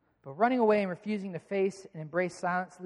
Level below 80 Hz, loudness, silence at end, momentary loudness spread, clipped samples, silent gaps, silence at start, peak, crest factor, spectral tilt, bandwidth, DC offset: -74 dBFS; -30 LUFS; 0 s; 10 LU; under 0.1%; none; 0.25 s; -12 dBFS; 18 dB; -6.5 dB/octave; 11 kHz; under 0.1%